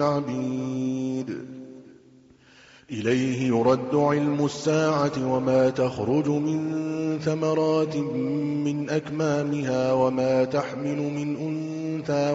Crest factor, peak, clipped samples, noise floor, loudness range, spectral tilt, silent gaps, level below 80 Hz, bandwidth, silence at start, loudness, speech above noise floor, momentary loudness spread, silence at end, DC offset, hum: 18 dB; -8 dBFS; under 0.1%; -54 dBFS; 4 LU; -6.5 dB/octave; none; -62 dBFS; 8 kHz; 0 s; -25 LUFS; 30 dB; 8 LU; 0 s; under 0.1%; none